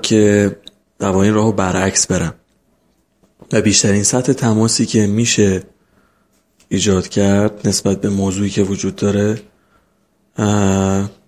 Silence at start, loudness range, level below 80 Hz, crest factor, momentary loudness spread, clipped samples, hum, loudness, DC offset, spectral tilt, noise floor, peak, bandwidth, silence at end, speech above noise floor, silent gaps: 0 s; 3 LU; -38 dBFS; 16 dB; 7 LU; under 0.1%; none; -15 LUFS; under 0.1%; -4.5 dB/octave; -60 dBFS; 0 dBFS; 14.5 kHz; 0.15 s; 46 dB; none